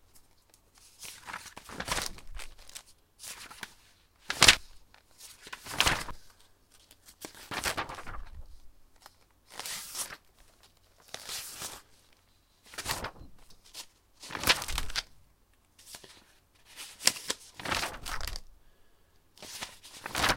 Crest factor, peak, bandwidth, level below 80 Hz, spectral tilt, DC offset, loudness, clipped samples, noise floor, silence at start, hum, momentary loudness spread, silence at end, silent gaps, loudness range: 36 dB; 0 dBFS; 17 kHz; -50 dBFS; -1 dB/octave; under 0.1%; -31 LUFS; under 0.1%; -66 dBFS; 0.15 s; none; 22 LU; 0 s; none; 13 LU